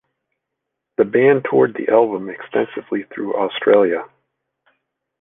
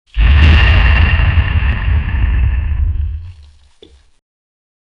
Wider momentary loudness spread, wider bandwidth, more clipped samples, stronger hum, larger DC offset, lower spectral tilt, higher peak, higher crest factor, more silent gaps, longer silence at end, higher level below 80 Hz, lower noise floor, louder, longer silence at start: about the same, 11 LU vs 10 LU; second, 3.8 kHz vs 5.6 kHz; neither; neither; neither; first, -9 dB/octave vs -7 dB/octave; about the same, 0 dBFS vs 0 dBFS; first, 18 dB vs 12 dB; neither; second, 1.15 s vs 1.65 s; second, -66 dBFS vs -14 dBFS; first, -79 dBFS vs -44 dBFS; second, -17 LUFS vs -13 LUFS; first, 1 s vs 0.15 s